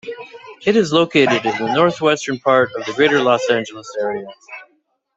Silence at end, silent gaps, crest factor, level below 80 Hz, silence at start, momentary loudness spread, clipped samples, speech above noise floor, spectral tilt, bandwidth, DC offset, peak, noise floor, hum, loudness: 0.55 s; none; 18 dB; -62 dBFS; 0.05 s; 19 LU; under 0.1%; 46 dB; -4.5 dB/octave; 8 kHz; under 0.1%; 0 dBFS; -63 dBFS; none; -16 LUFS